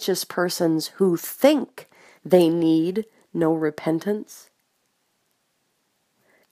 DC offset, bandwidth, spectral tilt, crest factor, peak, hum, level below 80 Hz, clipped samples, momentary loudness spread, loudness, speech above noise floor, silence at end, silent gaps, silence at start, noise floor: under 0.1%; 15.5 kHz; -5.5 dB/octave; 20 dB; -2 dBFS; none; -74 dBFS; under 0.1%; 12 LU; -22 LUFS; 49 dB; 2.15 s; none; 0 s; -71 dBFS